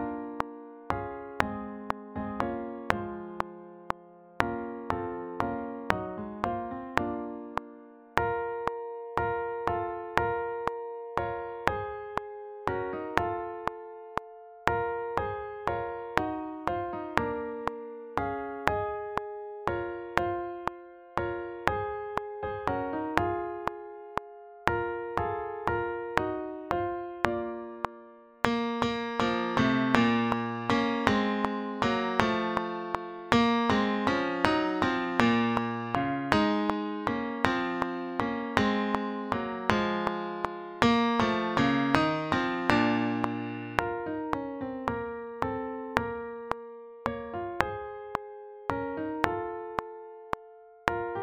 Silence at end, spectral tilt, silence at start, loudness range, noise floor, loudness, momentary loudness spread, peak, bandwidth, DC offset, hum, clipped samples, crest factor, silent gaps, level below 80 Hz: 0 s; -6 dB/octave; 0 s; 7 LU; -52 dBFS; -31 LUFS; 12 LU; -2 dBFS; 16.5 kHz; under 0.1%; none; under 0.1%; 30 dB; none; -52 dBFS